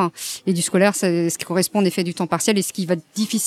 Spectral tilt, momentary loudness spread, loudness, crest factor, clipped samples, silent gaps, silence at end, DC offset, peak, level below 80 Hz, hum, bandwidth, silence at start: -4.5 dB/octave; 6 LU; -20 LUFS; 18 dB; under 0.1%; none; 0 s; under 0.1%; -4 dBFS; -70 dBFS; none; 16 kHz; 0 s